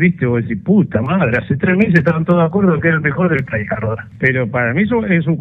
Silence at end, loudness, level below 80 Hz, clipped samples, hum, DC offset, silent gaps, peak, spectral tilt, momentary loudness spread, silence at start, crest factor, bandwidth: 0 s; -15 LUFS; -44 dBFS; under 0.1%; none; under 0.1%; none; 0 dBFS; -10 dB/octave; 6 LU; 0 s; 14 dB; 5.2 kHz